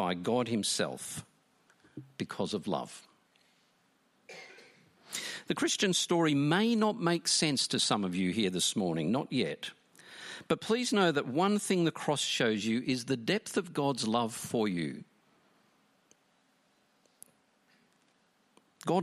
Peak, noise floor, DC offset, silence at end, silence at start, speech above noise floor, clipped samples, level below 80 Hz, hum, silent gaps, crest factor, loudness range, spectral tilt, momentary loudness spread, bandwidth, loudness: -12 dBFS; -71 dBFS; under 0.1%; 0 s; 0 s; 40 dB; under 0.1%; -74 dBFS; none; none; 20 dB; 13 LU; -4 dB/octave; 17 LU; 14.5 kHz; -31 LUFS